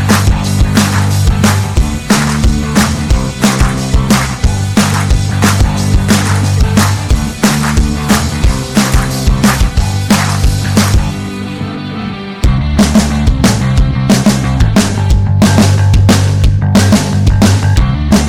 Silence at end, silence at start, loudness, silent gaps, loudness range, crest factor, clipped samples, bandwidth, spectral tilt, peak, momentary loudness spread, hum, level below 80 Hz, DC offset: 0 s; 0 s; -11 LUFS; none; 3 LU; 8 dB; under 0.1%; 16.5 kHz; -5 dB/octave; 0 dBFS; 5 LU; none; -16 dBFS; under 0.1%